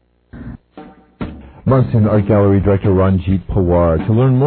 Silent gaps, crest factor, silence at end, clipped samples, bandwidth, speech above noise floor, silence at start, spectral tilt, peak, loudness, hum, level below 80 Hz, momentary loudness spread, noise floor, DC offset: none; 14 dB; 0 s; under 0.1%; 4.3 kHz; 27 dB; 0.35 s; -13.5 dB/octave; -2 dBFS; -14 LUFS; none; -32 dBFS; 19 LU; -39 dBFS; under 0.1%